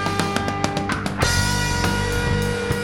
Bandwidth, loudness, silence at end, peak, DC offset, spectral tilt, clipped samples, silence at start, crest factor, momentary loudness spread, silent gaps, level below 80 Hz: 18.5 kHz; -21 LUFS; 0 s; -4 dBFS; 0.3%; -4 dB/octave; under 0.1%; 0 s; 18 dB; 4 LU; none; -32 dBFS